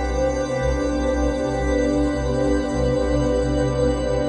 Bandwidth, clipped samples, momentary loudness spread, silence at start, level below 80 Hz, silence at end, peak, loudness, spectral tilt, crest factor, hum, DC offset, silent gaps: 10.5 kHz; under 0.1%; 2 LU; 0 s; -28 dBFS; 0 s; -8 dBFS; -21 LUFS; -6.5 dB/octave; 12 dB; none; under 0.1%; none